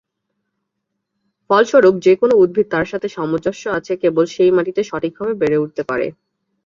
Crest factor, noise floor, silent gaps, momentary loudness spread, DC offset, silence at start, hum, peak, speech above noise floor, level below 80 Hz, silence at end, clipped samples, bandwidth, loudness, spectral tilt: 14 dB; -76 dBFS; none; 10 LU; under 0.1%; 1.5 s; none; -2 dBFS; 60 dB; -56 dBFS; 0.55 s; under 0.1%; 7.4 kHz; -16 LUFS; -6 dB/octave